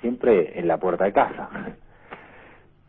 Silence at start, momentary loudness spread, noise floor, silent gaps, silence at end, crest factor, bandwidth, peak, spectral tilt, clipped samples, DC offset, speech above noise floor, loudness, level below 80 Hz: 0.05 s; 23 LU; -51 dBFS; none; 0.7 s; 18 dB; 3.9 kHz; -6 dBFS; -11 dB/octave; under 0.1%; under 0.1%; 29 dB; -22 LUFS; -56 dBFS